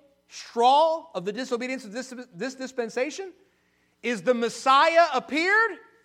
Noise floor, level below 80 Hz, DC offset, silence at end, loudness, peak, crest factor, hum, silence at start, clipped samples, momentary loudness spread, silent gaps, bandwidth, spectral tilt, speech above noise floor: -67 dBFS; -78 dBFS; under 0.1%; 0.25 s; -24 LUFS; -6 dBFS; 20 dB; 60 Hz at -70 dBFS; 0.35 s; under 0.1%; 17 LU; none; 13 kHz; -3 dB/octave; 43 dB